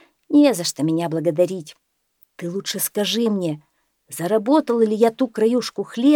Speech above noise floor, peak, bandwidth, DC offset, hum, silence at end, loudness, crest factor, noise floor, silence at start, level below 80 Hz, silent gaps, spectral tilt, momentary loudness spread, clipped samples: 42 dB; -2 dBFS; 19.5 kHz; under 0.1%; none; 0 s; -20 LUFS; 18 dB; -61 dBFS; 0.3 s; -76 dBFS; none; -5 dB/octave; 12 LU; under 0.1%